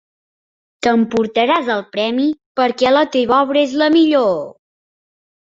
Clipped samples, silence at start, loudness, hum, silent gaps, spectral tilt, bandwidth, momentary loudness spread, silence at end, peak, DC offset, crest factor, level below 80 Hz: under 0.1%; 0.8 s; -15 LUFS; none; 2.46-2.55 s; -5 dB/octave; 7.8 kHz; 7 LU; 0.95 s; -2 dBFS; under 0.1%; 16 dB; -58 dBFS